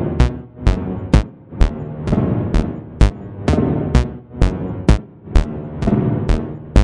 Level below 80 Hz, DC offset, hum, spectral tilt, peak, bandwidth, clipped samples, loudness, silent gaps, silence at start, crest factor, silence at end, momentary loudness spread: -20 dBFS; under 0.1%; none; -7.5 dB/octave; 0 dBFS; 10.5 kHz; under 0.1%; -19 LUFS; none; 0 s; 16 dB; 0 s; 6 LU